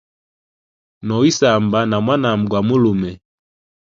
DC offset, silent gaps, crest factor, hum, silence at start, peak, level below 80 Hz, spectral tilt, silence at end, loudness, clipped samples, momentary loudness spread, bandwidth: under 0.1%; none; 18 dB; none; 1.05 s; 0 dBFS; -50 dBFS; -6 dB/octave; 0.7 s; -16 LUFS; under 0.1%; 9 LU; 7.6 kHz